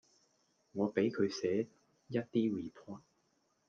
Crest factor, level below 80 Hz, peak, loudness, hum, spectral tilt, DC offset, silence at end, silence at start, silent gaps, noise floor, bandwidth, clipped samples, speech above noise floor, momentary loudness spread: 20 dB; -80 dBFS; -18 dBFS; -36 LUFS; none; -6.5 dB/octave; under 0.1%; 0.7 s; 0.75 s; none; -77 dBFS; 7.2 kHz; under 0.1%; 42 dB; 16 LU